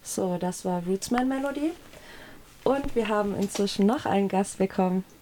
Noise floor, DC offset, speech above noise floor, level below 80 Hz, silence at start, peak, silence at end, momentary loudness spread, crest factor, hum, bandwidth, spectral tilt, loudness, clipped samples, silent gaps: -47 dBFS; under 0.1%; 21 dB; -50 dBFS; 0.05 s; -10 dBFS; 0.2 s; 11 LU; 18 dB; none; 18.5 kHz; -5.5 dB/octave; -27 LUFS; under 0.1%; none